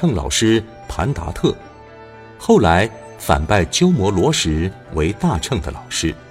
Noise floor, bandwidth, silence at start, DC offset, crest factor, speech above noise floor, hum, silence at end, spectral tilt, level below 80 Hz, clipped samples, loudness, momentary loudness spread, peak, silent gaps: -39 dBFS; 16 kHz; 0 s; under 0.1%; 18 dB; 22 dB; none; 0.05 s; -5 dB/octave; -32 dBFS; under 0.1%; -18 LUFS; 9 LU; 0 dBFS; none